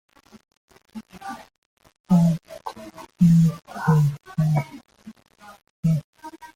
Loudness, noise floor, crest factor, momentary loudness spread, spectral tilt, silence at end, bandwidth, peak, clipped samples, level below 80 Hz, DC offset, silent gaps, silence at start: -21 LUFS; -42 dBFS; 16 dB; 24 LU; -8.5 dB/octave; 0.1 s; 14.5 kHz; -6 dBFS; under 0.1%; -54 dBFS; under 0.1%; 1.58-1.77 s, 2.00-2.04 s, 5.70-5.83 s, 6.04-6.13 s; 0.95 s